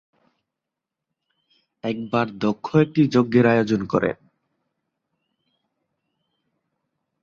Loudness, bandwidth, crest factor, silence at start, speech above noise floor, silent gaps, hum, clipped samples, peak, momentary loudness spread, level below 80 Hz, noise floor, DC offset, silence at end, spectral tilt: -21 LUFS; 7.2 kHz; 20 dB; 1.85 s; 65 dB; none; none; under 0.1%; -4 dBFS; 12 LU; -60 dBFS; -85 dBFS; under 0.1%; 3.1 s; -8 dB/octave